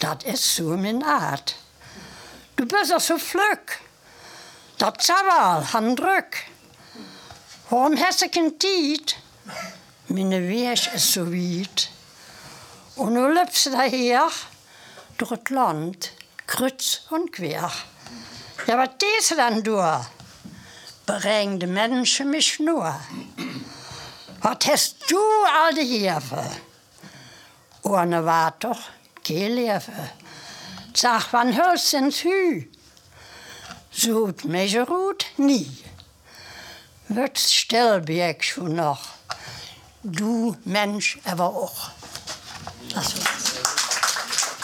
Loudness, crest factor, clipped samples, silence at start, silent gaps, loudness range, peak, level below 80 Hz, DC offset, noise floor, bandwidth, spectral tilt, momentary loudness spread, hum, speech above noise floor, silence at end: -22 LUFS; 24 dB; under 0.1%; 0 s; none; 4 LU; 0 dBFS; -64 dBFS; under 0.1%; -51 dBFS; 19.5 kHz; -3 dB/octave; 21 LU; none; 29 dB; 0 s